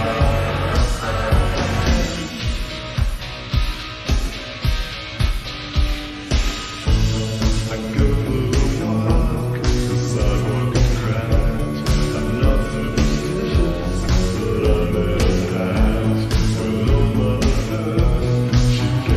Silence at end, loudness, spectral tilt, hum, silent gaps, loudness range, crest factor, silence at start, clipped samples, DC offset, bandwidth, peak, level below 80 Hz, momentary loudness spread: 0 s; -20 LUFS; -6 dB/octave; none; none; 5 LU; 16 dB; 0 s; under 0.1%; under 0.1%; 14 kHz; -2 dBFS; -22 dBFS; 6 LU